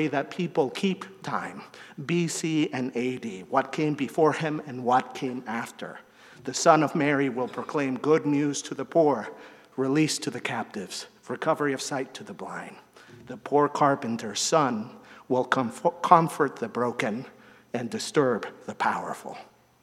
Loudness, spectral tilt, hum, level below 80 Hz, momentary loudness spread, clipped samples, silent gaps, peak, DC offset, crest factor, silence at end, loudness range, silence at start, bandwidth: -26 LUFS; -4.5 dB/octave; none; -76 dBFS; 16 LU; under 0.1%; none; 0 dBFS; under 0.1%; 26 dB; 0.4 s; 5 LU; 0 s; 15 kHz